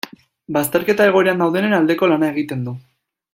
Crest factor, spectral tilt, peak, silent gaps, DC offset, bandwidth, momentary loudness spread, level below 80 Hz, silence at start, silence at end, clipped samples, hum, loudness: 16 dB; -5.5 dB/octave; -2 dBFS; none; under 0.1%; 16.5 kHz; 14 LU; -60 dBFS; 0.5 s; 0.55 s; under 0.1%; none; -17 LUFS